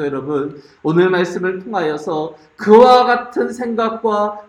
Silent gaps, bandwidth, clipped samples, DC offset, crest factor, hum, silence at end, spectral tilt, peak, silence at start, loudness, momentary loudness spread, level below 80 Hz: none; 10.5 kHz; under 0.1%; under 0.1%; 16 dB; none; 0.05 s; -6 dB/octave; 0 dBFS; 0 s; -15 LUFS; 14 LU; -58 dBFS